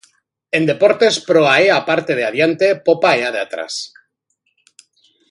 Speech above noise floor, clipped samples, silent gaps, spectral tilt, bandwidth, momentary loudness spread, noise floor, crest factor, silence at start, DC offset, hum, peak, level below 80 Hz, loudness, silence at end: 53 dB; under 0.1%; none; -4 dB/octave; 11.5 kHz; 12 LU; -68 dBFS; 16 dB; 0.55 s; under 0.1%; none; 0 dBFS; -66 dBFS; -15 LUFS; 1.45 s